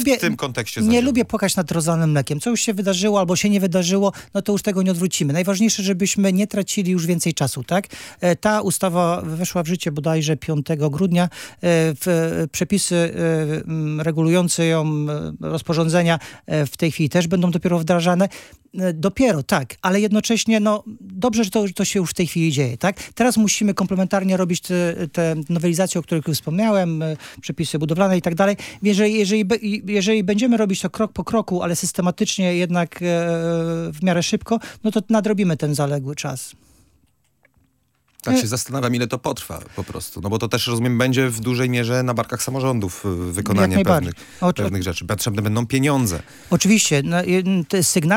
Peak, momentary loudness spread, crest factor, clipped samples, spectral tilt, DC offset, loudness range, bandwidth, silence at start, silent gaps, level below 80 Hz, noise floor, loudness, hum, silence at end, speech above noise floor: -2 dBFS; 7 LU; 18 dB; under 0.1%; -5 dB/octave; under 0.1%; 3 LU; 17 kHz; 0 s; none; -52 dBFS; -65 dBFS; -20 LUFS; none; 0 s; 45 dB